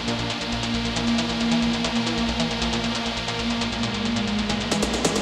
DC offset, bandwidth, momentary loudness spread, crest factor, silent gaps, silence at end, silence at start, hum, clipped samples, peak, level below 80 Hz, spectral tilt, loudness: under 0.1%; 13 kHz; 4 LU; 18 dB; none; 0 s; 0 s; none; under 0.1%; -6 dBFS; -38 dBFS; -4 dB/octave; -24 LUFS